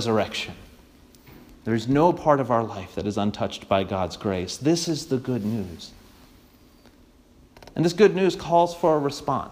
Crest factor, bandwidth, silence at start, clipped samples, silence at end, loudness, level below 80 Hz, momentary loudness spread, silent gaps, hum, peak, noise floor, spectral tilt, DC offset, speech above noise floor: 20 dB; 15.5 kHz; 0 s; under 0.1%; 0 s; -24 LUFS; -54 dBFS; 12 LU; none; none; -4 dBFS; -54 dBFS; -5.5 dB/octave; under 0.1%; 31 dB